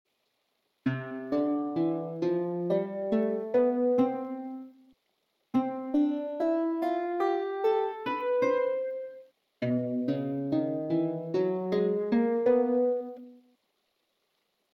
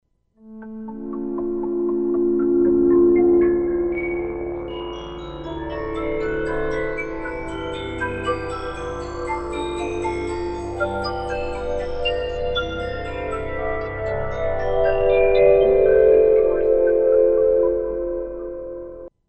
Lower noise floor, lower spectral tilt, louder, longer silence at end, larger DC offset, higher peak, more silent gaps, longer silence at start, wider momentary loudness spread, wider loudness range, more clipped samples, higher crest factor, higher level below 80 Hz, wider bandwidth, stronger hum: first, -77 dBFS vs -48 dBFS; first, -9 dB/octave vs -7 dB/octave; second, -29 LUFS vs -21 LUFS; first, 1.4 s vs 0.2 s; neither; second, -14 dBFS vs -4 dBFS; neither; first, 0.85 s vs 0.45 s; second, 10 LU vs 15 LU; second, 3 LU vs 10 LU; neither; about the same, 16 dB vs 16 dB; second, -76 dBFS vs -36 dBFS; second, 6.6 kHz vs 8.4 kHz; neither